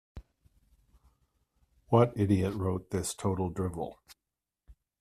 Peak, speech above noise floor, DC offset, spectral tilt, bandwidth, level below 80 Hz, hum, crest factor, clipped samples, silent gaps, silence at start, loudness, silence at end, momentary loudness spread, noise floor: -10 dBFS; 59 dB; under 0.1%; -7 dB/octave; 14.5 kHz; -58 dBFS; none; 24 dB; under 0.1%; none; 0.15 s; -30 LUFS; 0.3 s; 9 LU; -89 dBFS